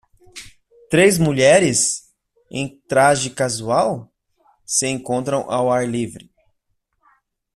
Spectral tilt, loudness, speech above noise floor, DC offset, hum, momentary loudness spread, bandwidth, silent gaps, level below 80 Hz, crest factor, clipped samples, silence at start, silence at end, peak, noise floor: -4 dB/octave; -18 LUFS; 53 dB; under 0.1%; none; 16 LU; 14 kHz; none; -54 dBFS; 18 dB; under 0.1%; 0.35 s; 1.35 s; -2 dBFS; -71 dBFS